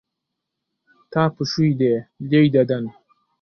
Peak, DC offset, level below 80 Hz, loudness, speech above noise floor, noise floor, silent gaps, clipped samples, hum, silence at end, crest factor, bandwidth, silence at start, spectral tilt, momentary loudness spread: -4 dBFS; under 0.1%; -60 dBFS; -20 LUFS; 62 dB; -81 dBFS; none; under 0.1%; none; 0.5 s; 18 dB; 6.6 kHz; 1.1 s; -7.5 dB/octave; 10 LU